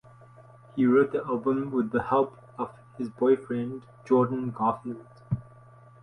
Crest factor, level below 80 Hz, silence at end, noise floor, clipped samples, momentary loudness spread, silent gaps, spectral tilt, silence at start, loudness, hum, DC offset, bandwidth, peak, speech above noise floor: 16 dB; -62 dBFS; 0.6 s; -52 dBFS; under 0.1%; 14 LU; none; -9.5 dB/octave; 0.75 s; -27 LUFS; none; under 0.1%; 5.8 kHz; -10 dBFS; 26 dB